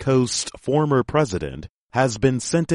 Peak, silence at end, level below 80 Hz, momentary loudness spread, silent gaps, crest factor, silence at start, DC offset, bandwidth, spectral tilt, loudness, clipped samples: -4 dBFS; 0 s; -46 dBFS; 9 LU; 1.69-1.89 s; 16 dB; 0 s; under 0.1%; 11.5 kHz; -5.5 dB/octave; -21 LUFS; under 0.1%